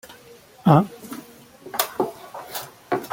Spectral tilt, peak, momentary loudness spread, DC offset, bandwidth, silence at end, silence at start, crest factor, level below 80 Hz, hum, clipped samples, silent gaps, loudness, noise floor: -6 dB/octave; -2 dBFS; 21 LU; under 0.1%; 17 kHz; 0.05 s; 0.05 s; 22 dB; -62 dBFS; none; under 0.1%; none; -23 LUFS; -48 dBFS